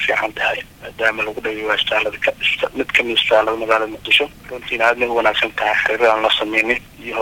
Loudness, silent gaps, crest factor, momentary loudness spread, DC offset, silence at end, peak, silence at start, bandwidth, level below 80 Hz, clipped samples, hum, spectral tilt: -17 LUFS; none; 16 dB; 8 LU; under 0.1%; 0 s; -2 dBFS; 0 s; 17 kHz; -48 dBFS; under 0.1%; none; -3 dB/octave